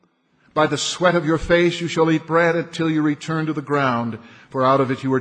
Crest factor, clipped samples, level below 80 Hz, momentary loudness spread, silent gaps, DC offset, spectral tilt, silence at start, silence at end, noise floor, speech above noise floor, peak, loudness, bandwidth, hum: 16 dB; under 0.1%; -46 dBFS; 7 LU; none; under 0.1%; -5.5 dB/octave; 0.55 s; 0 s; -60 dBFS; 41 dB; -4 dBFS; -19 LUFS; 10 kHz; none